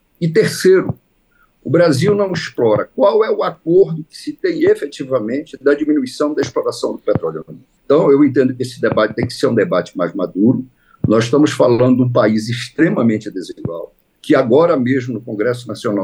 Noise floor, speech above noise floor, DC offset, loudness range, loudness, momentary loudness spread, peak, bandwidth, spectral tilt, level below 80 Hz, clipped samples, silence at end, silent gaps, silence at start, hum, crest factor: -57 dBFS; 42 dB; under 0.1%; 3 LU; -15 LUFS; 12 LU; -2 dBFS; 12.5 kHz; -6.5 dB/octave; -54 dBFS; under 0.1%; 0 s; none; 0.2 s; none; 14 dB